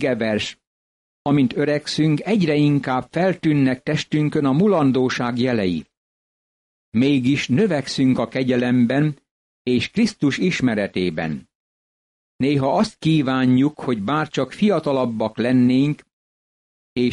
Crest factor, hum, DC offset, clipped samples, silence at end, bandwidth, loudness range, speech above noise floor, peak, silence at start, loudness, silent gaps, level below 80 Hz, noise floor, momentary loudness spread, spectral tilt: 12 dB; none; under 0.1%; under 0.1%; 0 s; 11 kHz; 3 LU; over 71 dB; -8 dBFS; 0 s; -20 LUFS; 0.67-1.25 s, 5.97-6.92 s, 9.31-9.65 s, 11.55-12.39 s, 16.13-16.96 s; -56 dBFS; under -90 dBFS; 7 LU; -6.5 dB/octave